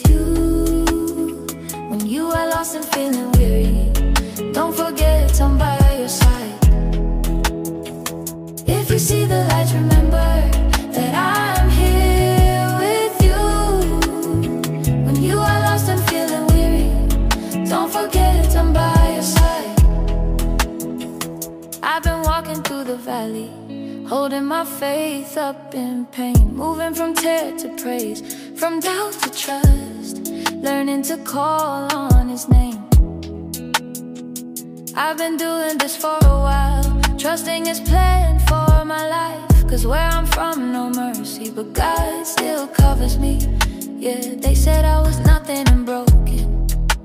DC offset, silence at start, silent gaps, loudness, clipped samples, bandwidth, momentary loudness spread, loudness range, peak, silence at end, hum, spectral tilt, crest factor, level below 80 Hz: under 0.1%; 0 s; none; -18 LUFS; under 0.1%; 16 kHz; 11 LU; 5 LU; -2 dBFS; 0 s; none; -5.5 dB/octave; 14 dB; -20 dBFS